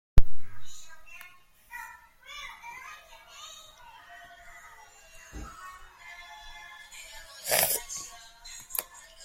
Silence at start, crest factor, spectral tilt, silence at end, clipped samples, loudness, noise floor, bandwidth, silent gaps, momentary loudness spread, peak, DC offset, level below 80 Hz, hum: 0.15 s; 24 dB; -2 dB/octave; 0.45 s; under 0.1%; -34 LUFS; -55 dBFS; 16.5 kHz; none; 22 LU; -2 dBFS; under 0.1%; -38 dBFS; none